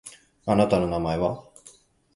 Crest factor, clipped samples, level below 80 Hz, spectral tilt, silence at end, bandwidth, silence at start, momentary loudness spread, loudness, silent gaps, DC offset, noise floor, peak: 20 dB; under 0.1%; -48 dBFS; -7 dB/octave; 0.45 s; 11.5 kHz; 0.05 s; 17 LU; -24 LUFS; none; under 0.1%; -54 dBFS; -6 dBFS